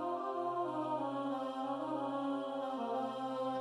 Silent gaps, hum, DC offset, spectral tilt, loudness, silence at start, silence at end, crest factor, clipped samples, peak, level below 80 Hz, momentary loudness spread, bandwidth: none; none; under 0.1%; -6.5 dB/octave; -38 LUFS; 0 s; 0 s; 12 dB; under 0.1%; -26 dBFS; -86 dBFS; 2 LU; 11 kHz